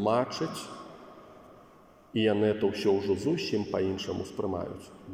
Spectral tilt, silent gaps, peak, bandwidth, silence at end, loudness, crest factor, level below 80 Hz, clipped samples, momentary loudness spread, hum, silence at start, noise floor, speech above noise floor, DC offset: -6 dB/octave; none; -12 dBFS; 15.5 kHz; 0 s; -30 LUFS; 18 dB; -66 dBFS; under 0.1%; 19 LU; none; 0 s; -56 dBFS; 27 dB; under 0.1%